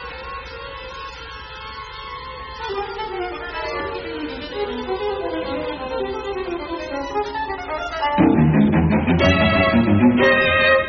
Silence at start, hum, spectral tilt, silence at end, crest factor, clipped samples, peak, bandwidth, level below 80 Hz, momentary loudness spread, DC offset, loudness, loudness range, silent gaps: 0 s; none; -4.5 dB/octave; 0 s; 16 dB; under 0.1%; -4 dBFS; 6.6 kHz; -38 dBFS; 18 LU; under 0.1%; -20 LUFS; 13 LU; none